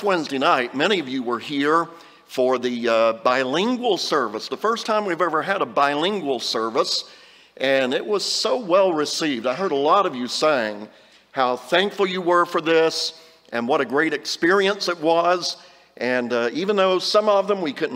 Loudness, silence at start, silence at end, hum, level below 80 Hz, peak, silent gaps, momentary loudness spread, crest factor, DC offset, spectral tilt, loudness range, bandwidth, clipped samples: -21 LUFS; 0 s; 0 s; none; -74 dBFS; -2 dBFS; none; 7 LU; 18 dB; under 0.1%; -3.5 dB/octave; 1 LU; 16 kHz; under 0.1%